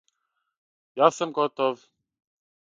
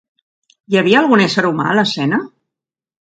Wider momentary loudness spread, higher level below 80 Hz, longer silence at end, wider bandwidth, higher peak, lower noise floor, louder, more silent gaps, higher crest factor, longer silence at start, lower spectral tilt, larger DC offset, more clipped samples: first, 17 LU vs 8 LU; second, -80 dBFS vs -62 dBFS; about the same, 1 s vs 0.9 s; about the same, 9.4 kHz vs 9 kHz; second, -4 dBFS vs 0 dBFS; second, -79 dBFS vs -85 dBFS; second, -24 LUFS vs -14 LUFS; neither; first, 24 dB vs 16 dB; first, 0.95 s vs 0.7 s; about the same, -4.5 dB/octave vs -5.5 dB/octave; neither; neither